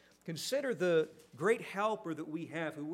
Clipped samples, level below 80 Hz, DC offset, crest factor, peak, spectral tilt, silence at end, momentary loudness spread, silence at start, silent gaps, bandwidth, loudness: under 0.1%; -84 dBFS; under 0.1%; 18 dB; -18 dBFS; -5 dB/octave; 0 s; 9 LU; 0.25 s; none; 16 kHz; -36 LUFS